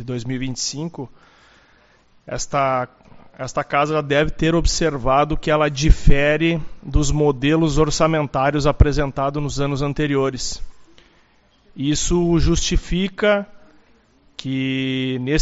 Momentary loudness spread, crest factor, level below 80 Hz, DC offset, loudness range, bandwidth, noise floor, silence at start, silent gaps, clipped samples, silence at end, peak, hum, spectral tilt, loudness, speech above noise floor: 10 LU; 20 dB; -26 dBFS; under 0.1%; 6 LU; 8 kHz; -56 dBFS; 0 s; none; under 0.1%; 0 s; 0 dBFS; none; -5 dB/octave; -20 LUFS; 38 dB